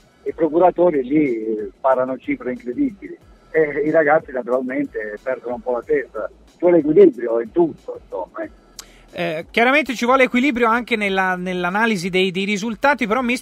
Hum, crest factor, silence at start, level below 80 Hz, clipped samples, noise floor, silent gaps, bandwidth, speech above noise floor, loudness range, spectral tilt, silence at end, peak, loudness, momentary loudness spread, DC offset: none; 18 dB; 0.25 s; -52 dBFS; under 0.1%; -42 dBFS; none; 15 kHz; 24 dB; 3 LU; -5.5 dB/octave; 0 s; -2 dBFS; -18 LUFS; 15 LU; under 0.1%